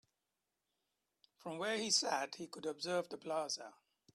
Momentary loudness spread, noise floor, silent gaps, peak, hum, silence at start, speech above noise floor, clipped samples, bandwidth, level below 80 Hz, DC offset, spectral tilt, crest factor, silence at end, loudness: 13 LU; -89 dBFS; none; -20 dBFS; none; 1.45 s; 49 dB; under 0.1%; 13.5 kHz; -88 dBFS; under 0.1%; -1.5 dB/octave; 22 dB; 0.45 s; -39 LUFS